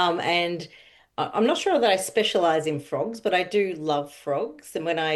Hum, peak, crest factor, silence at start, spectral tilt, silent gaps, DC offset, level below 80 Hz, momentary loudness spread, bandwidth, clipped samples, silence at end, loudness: none; -8 dBFS; 16 dB; 0 s; -4 dB/octave; none; under 0.1%; -70 dBFS; 10 LU; 12.5 kHz; under 0.1%; 0 s; -24 LUFS